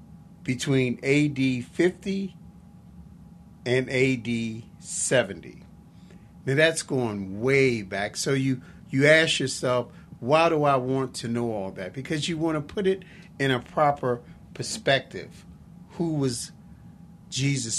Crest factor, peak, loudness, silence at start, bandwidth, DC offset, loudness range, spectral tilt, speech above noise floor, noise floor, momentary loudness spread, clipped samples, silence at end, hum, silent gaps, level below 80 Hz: 24 dB; -4 dBFS; -25 LUFS; 0 s; 13 kHz; under 0.1%; 5 LU; -4.5 dB/octave; 24 dB; -49 dBFS; 14 LU; under 0.1%; 0 s; none; none; -56 dBFS